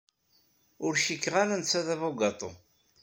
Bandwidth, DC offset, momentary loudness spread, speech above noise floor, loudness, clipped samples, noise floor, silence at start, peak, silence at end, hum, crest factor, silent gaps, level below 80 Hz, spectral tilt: 16.5 kHz; under 0.1%; 9 LU; 40 dB; -29 LUFS; under 0.1%; -69 dBFS; 0.8 s; -10 dBFS; 0.45 s; none; 20 dB; none; -72 dBFS; -3 dB/octave